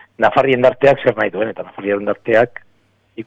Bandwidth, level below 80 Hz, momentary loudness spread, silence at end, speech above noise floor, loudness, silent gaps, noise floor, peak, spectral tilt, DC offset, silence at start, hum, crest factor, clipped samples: 7.8 kHz; -54 dBFS; 10 LU; 0 s; 42 dB; -16 LUFS; none; -57 dBFS; -2 dBFS; -7 dB/octave; under 0.1%; 0.2 s; none; 14 dB; under 0.1%